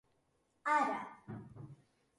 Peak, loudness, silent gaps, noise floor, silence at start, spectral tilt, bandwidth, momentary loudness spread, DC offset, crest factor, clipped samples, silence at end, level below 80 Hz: -20 dBFS; -36 LUFS; none; -78 dBFS; 0.65 s; -5.5 dB/octave; 11.5 kHz; 21 LU; under 0.1%; 20 dB; under 0.1%; 0.45 s; -76 dBFS